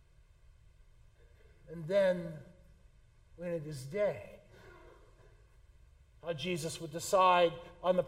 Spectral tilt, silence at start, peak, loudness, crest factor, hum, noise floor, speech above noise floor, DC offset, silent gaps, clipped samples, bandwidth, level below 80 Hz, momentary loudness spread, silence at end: -4.5 dB/octave; 1.65 s; -14 dBFS; -33 LUFS; 22 dB; none; -62 dBFS; 29 dB; under 0.1%; none; under 0.1%; 16 kHz; -62 dBFS; 20 LU; 0 s